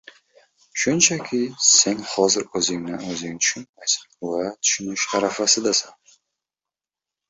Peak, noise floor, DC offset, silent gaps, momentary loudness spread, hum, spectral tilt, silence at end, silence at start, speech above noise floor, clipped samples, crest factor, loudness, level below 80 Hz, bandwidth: -2 dBFS; -90 dBFS; under 0.1%; 3.69-3.73 s; 13 LU; none; -1.5 dB/octave; 1.4 s; 0.75 s; 68 dB; under 0.1%; 22 dB; -20 LUFS; -64 dBFS; 8.4 kHz